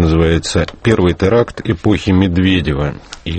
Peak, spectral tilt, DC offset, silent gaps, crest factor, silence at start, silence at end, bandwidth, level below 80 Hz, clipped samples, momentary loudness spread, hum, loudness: 0 dBFS; -6.5 dB/octave; under 0.1%; none; 14 dB; 0 s; 0 s; 8.8 kHz; -28 dBFS; under 0.1%; 6 LU; none; -14 LUFS